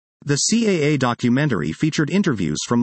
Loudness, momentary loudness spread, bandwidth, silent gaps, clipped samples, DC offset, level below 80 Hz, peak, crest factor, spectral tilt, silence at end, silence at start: -19 LUFS; 4 LU; 8.8 kHz; none; under 0.1%; under 0.1%; -54 dBFS; -4 dBFS; 14 dB; -5 dB/octave; 0 s; 0.25 s